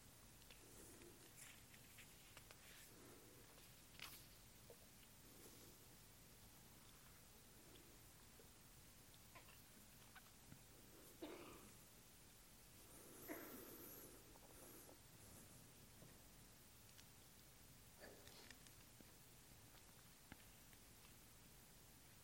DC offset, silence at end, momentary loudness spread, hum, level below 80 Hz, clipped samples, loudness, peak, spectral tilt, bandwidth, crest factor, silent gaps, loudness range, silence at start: under 0.1%; 0 s; 7 LU; none; -76 dBFS; under 0.1%; -63 LUFS; -38 dBFS; -3 dB/octave; 16.5 kHz; 26 dB; none; 5 LU; 0 s